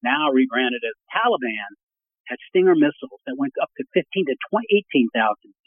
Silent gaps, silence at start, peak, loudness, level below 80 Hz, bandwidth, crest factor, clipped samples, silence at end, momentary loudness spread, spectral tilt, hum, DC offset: 1.83-1.89 s, 2.20-2.24 s; 0.05 s; -6 dBFS; -21 LUFS; -86 dBFS; 3.6 kHz; 16 dB; under 0.1%; 0.35 s; 13 LU; -10 dB/octave; none; under 0.1%